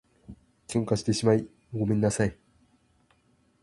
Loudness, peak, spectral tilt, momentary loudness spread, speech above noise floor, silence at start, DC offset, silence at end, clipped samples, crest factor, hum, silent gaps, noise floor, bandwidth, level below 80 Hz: -27 LUFS; -8 dBFS; -6 dB/octave; 8 LU; 41 dB; 0.3 s; under 0.1%; 1.3 s; under 0.1%; 20 dB; none; none; -66 dBFS; 11.5 kHz; -54 dBFS